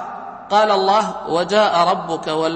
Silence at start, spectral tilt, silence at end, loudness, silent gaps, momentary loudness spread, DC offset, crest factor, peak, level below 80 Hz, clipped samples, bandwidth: 0 s; -4.5 dB/octave; 0 s; -17 LUFS; none; 8 LU; under 0.1%; 16 dB; -2 dBFS; -58 dBFS; under 0.1%; 8.8 kHz